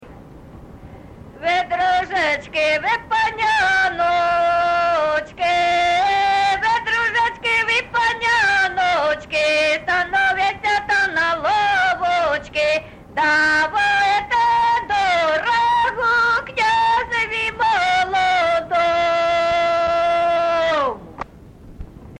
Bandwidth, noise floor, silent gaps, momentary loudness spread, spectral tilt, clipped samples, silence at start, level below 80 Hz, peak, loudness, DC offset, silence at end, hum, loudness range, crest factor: 10.5 kHz; -41 dBFS; none; 4 LU; -2.5 dB/octave; under 0.1%; 0 s; -46 dBFS; -8 dBFS; -17 LUFS; under 0.1%; 0 s; none; 2 LU; 10 dB